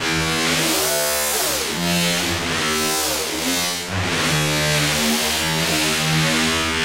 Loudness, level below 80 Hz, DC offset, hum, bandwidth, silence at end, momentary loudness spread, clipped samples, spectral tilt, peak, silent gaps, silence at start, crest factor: -18 LUFS; -42 dBFS; under 0.1%; none; 16 kHz; 0 s; 3 LU; under 0.1%; -2.5 dB/octave; -6 dBFS; none; 0 s; 14 dB